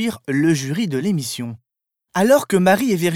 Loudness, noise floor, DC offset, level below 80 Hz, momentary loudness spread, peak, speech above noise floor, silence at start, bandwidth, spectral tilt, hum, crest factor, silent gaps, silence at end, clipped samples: -18 LUFS; -80 dBFS; under 0.1%; -62 dBFS; 11 LU; -2 dBFS; 62 dB; 0 s; 17.5 kHz; -5.5 dB/octave; none; 16 dB; none; 0 s; under 0.1%